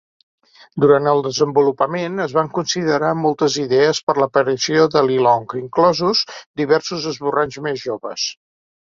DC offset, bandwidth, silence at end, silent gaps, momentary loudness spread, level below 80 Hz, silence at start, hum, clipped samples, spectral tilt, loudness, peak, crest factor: under 0.1%; 7.6 kHz; 0.55 s; 4.03-4.07 s, 6.46-6.54 s; 9 LU; -60 dBFS; 0.75 s; none; under 0.1%; -4.5 dB/octave; -18 LUFS; -2 dBFS; 16 dB